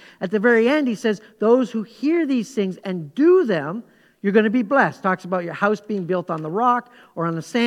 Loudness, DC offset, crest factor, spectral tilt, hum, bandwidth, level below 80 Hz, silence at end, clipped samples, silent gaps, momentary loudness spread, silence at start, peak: -20 LUFS; under 0.1%; 18 dB; -6.5 dB/octave; none; 12.5 kHz; -74 dBFS; 0 s; under 0.1%; none; 10 LU; 0.2 s; -2 dBFS